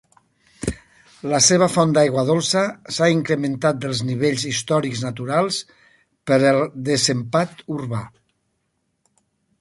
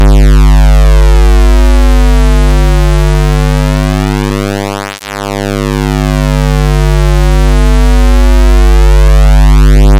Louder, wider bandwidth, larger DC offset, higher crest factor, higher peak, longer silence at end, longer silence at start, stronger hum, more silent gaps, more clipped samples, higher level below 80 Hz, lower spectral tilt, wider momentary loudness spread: second, -20 LUFS vs -9 LUFS; second, 11.5 kHz vs 13 kHz; neither; first, 18 dB vs 6 dB; about the same, -2 dBFS vs 0 dBFS; first, 1.55 s vs 0 s; first, 0.6 s vs 0 s; neither; neither; neither; second, -50 dBFS vs -6 dBFS; second, -4 dB/octave vs -6.5 dB/octave; first, 13 LU vs 7 LU